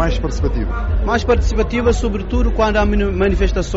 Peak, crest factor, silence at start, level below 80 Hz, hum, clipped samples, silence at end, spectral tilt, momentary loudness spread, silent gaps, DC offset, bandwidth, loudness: -4 dBFS; 10 dB; 0 s; -18 dBFS; none; under 0.1%; 0 s; -6 dB/octave; 5 LU; none; under 0.1%; 8 kHz; -17 LUFS